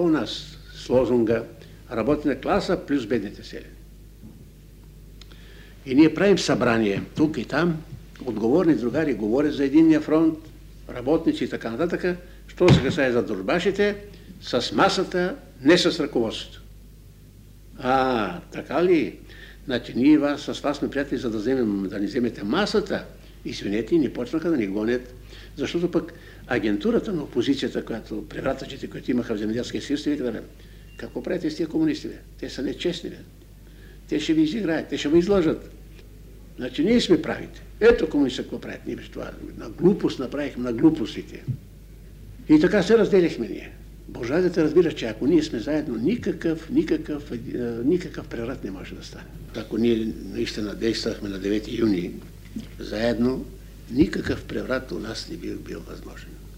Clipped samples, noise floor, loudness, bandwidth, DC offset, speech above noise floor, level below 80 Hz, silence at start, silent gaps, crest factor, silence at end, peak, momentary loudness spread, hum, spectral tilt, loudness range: under 0.1%; -47 dBFS; -24 LUFS; 15.5 kHz; under 0.1%; 24 dB; -44 dBFS; 0 s; none; 20 dB; 0 s; -4 dBFS; 18 LU; none; -6 dB/octave; 6 LU